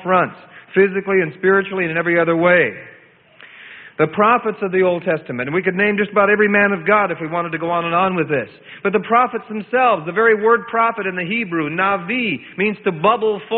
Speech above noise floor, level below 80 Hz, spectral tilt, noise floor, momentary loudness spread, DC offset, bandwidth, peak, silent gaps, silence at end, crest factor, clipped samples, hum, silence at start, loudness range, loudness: 30 dB; -60 dBFS; -11 dB/octave; -47 dBFS; 8 LU; under 0.1%; 4.3 kHz; -2 dBFS; none; 0 s; 16 dB; under 0.1%; none; 0 s; 2 LU; -17 LUFS